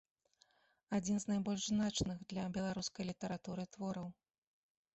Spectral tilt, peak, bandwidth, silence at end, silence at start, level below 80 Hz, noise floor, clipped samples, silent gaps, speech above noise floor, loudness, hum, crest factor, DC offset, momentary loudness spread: -5 dB/octave; -24 dBFS; 8.2 kHz; 0.8 s; 0.9 s; -64 dBFS; -74 dBFS; under 0.1%; none; 35 dB; -40 LUFS; none; 18 dB; under 0.1%; 8 LU